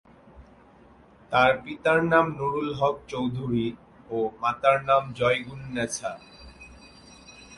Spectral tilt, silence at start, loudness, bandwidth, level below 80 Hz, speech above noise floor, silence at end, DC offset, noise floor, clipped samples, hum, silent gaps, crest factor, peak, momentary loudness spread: -5 dB/octave; 0.35 s; -25 LUFS; 11.5 kHz; -56 dBFS; 29 dB; 0 s; under 0.1%; -54 dBFS; under 0.1%; none; none; 20 dB; -6 dBFS; 13 LU